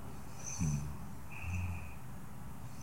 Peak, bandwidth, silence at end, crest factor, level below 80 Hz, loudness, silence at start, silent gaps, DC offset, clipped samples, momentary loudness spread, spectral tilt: -22 dBFS; 16.5 kHz; 0 s; 18 dB; -54 dBFS; -42 LUFS; 0 s; none; 0.6%; under 0.1%; 13 LU; -5 dB/octave